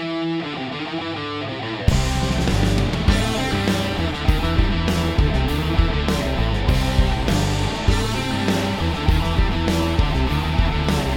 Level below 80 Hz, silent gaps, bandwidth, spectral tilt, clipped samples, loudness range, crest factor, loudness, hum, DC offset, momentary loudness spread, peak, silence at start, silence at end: -24 dBFS; none; 17 kHz; -5.5 dB/octave; under 0.1%; 1 LU; 18 dB; -21 LUFS; none; under 0.1%; 6 LU; -2 dBFS; 0 s; 0 s